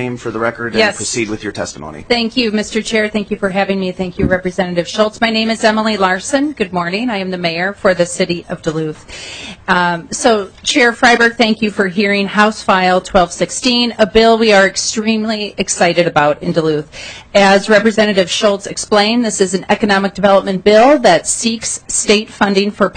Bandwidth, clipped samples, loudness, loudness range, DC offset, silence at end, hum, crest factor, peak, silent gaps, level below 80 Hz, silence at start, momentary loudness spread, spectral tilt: 9.4 kHz; under 0.1%; -13 LUFS; 5 LU; under 0.1%; 0.05 s; none; 14 dB; 0 dBFS; none; -40 dBFS; 0 s; 10 LU; -3.5 dB/octave